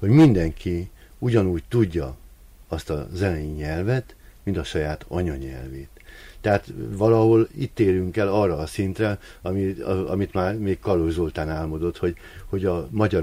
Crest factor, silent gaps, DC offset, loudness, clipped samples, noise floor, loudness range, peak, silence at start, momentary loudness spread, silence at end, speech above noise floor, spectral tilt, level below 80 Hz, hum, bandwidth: 18 dB; none; under 0.1%; -24 LUFS; under 0.1%; -47 dBFS; 6 LU; -6 dBFS; 0 s; 14 LU; 0 s; 25 dB; -8 dB/octave; -40 dBFS; none; 15.5 kHz